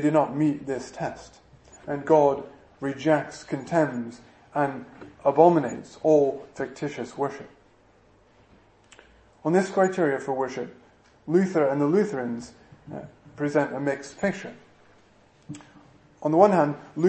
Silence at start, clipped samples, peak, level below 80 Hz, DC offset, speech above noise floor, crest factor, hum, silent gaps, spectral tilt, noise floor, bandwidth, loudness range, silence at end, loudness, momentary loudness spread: 0 s; under 0.1%; -2 dBFS; -64 dBFS; under 0.1%; 34 dB; 22 dB; none; none; -7 dB/octave; -58 dBFS; 8.8 kHz; 7 LU; 0 s; -25 LUFS; 22 LU